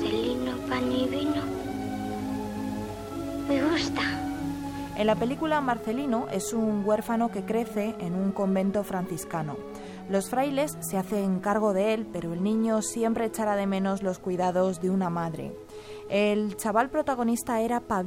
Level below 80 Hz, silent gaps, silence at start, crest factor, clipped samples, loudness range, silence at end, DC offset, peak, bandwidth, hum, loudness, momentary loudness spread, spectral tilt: -54 dBFS; none; 0 s; 18 dB; under 0.1%; 3 LU; 0 s; under 0.1%; -10 dBFS; 17 kHz; none; -28 LUFS; 8 LU; -5.5 dB/octave